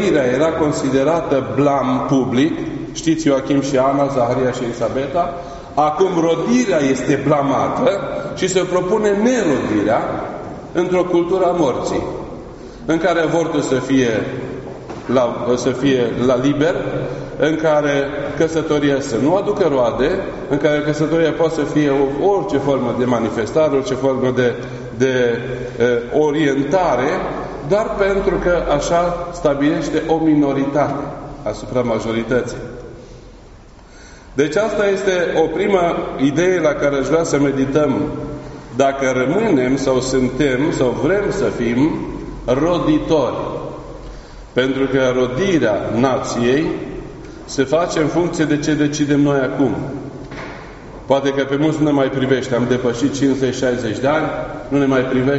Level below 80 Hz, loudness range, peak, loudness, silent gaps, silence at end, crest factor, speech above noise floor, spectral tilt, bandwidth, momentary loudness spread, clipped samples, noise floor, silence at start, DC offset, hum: -40 dBFS; 2 LU; 0 dBFS; -17 LUFS; none; 0 s; 16 dB; 24 dB; -5.5 dB/octave; 8 kHz; 11 LU; under 0.1%; -40 dBFS; 0 s; under 0.1%; none